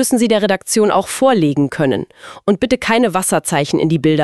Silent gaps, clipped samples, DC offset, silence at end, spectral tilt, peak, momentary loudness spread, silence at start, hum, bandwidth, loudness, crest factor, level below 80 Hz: none; under 0.1%; 0.3%; 0 s; -4.5 dB/octave; 0 dBFS; 5 LU; 0 s; none; 12.5 kHz; -15 LUFS; 14 dB; -48 dBFS